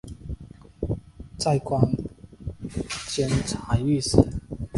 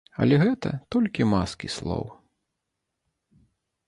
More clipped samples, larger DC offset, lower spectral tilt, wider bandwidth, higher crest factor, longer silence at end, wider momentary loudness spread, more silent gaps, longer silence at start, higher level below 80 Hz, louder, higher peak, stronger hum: neither; neither; about the same, -6 dB/octave vs -7 dB/octave; about the same, 11.5 kHz vs 11.5 kHz; first, 26 dB vs 20 dB; second, 0 s vs 1.75 s; first, 18 LU vs 12 LU; neither; second, 0.05 s vs 0.2 s; first, -38 dBFS vs -48 dBFS; about the same, -25 LUFS vs -25 LUFS; first, 0 dBFS vs -8 dBFS; neither